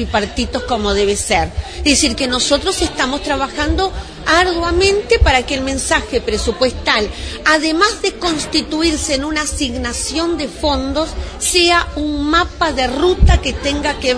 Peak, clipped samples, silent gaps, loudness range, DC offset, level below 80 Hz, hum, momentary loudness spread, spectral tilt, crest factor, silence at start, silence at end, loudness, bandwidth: 0 dBFS; under 0.1%; none; 2 LU; under 0.1%; -24 dBFS; none; 7 LU; -3.5 dB/octave; 16 dB; 0 s; 0 s; -15 LUFS; 11 kHz